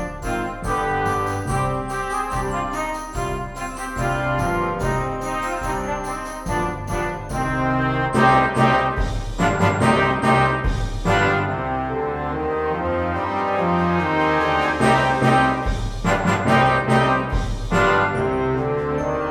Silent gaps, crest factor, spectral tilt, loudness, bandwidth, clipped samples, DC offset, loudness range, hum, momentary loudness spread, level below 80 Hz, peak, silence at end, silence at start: none; 18 dB; -6 dB/octave; -21 LUFS; 17.5 kHz; under 0.1%; under 0.1%; 6 LU; none; 9 LU; -32 dBFS; -2 dBFS; 0 s; 0 s